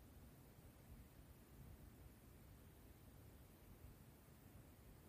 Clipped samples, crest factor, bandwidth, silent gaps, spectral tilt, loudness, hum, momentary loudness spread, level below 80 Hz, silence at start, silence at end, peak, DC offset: under 0.1%; 12 dB; 15.5 kHz; none; -5.5 dB/octave; -65 LUFS; none; 2 LU; -68 dBFS; 0 s; 0 s; -50 dBFS; under 0.1%